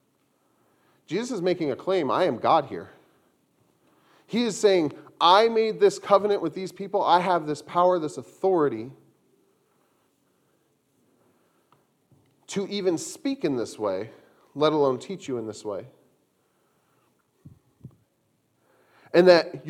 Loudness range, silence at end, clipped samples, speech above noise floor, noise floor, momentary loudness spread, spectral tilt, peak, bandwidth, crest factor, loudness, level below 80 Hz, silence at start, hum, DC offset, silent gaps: 12 LU; 0 s; under 0.1%; 47 dB; -70 dBFS; 15 LU; -5 dB/octave; -2 dBFS; 13 kHz; 24 dB; -24 LUFS; -76 dBFS; 1.1 s; none; under 0.1%; none